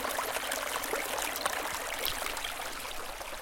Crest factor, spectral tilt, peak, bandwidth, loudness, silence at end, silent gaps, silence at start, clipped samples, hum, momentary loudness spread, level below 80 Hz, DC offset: 24 dB; -0.5 dB/octave; -10 dBFS; 17 kHz; -34 LUFS; 0 s; none; 0 s; under 0.1%; none; 6 LU; -54 dBFS; under 0.1%